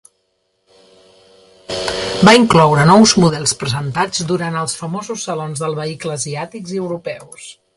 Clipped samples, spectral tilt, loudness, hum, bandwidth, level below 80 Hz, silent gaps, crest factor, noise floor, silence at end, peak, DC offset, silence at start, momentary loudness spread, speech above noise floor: under 0.1%; -4.5 dB/octave; -15 LUFS; none; 11.5 kHz; -48 dBFS; none; 16 dB; -66 dBFS; 0.25 s; 0 dBFS; under 0.1%; 1.7 s; 17 LU; 51 dB